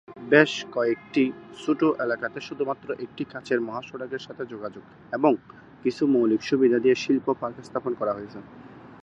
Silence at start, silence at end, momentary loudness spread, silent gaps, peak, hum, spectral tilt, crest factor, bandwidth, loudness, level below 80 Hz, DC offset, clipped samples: 0.1 s; 0.05 s; 14 LU; none; -2 dBFS; none; -5.5 dB/octave; 24 dB; 8.2 kHz; -25 LUFS; -68 dBFS; under 0.1%; under 0.1%